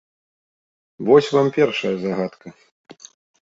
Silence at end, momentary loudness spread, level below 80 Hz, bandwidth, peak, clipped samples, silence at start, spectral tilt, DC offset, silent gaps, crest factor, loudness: 0.5 s; 12 LU; -64 dBFS; 7.8 kHz; -2 dBFS; under 0.1%; 1 s; -6 dB/octave; under 0.1%; 2.72-2.84 s; 20 dB; -19 LUFS